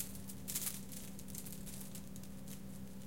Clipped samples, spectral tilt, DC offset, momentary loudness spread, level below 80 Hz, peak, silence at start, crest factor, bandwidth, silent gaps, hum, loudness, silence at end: under 0.1%; -3.5 dB/octave; 0.3%; 11 LU; -62 dBFS; -20 dBFS; 0 s; 26 dB; 17 kHz; none; none; -46 LUFS; 0 s